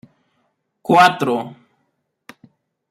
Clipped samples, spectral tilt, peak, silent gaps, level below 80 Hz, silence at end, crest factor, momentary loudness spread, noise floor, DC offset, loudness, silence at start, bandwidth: under 0.1%; -5 dB/octave; -2 dBFS; none; -66 dBFS; 1.4 s; 20 dB; 20 LU; -70 dBFS; under 0.1%; -15 LUFS; 0.9 s; 16 kHz